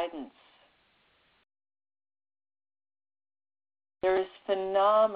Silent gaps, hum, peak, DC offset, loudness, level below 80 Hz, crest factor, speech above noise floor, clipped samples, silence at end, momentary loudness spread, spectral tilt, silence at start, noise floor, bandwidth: none; none; -14 dBFS; under 0.1%; -28 LUFS; -70 dBFS; 18 dB; 41 dB; under 0.1%; 0 s; 18 LU; -2 dB/octave; 0 s; -68 dBFS; 4.9 kHz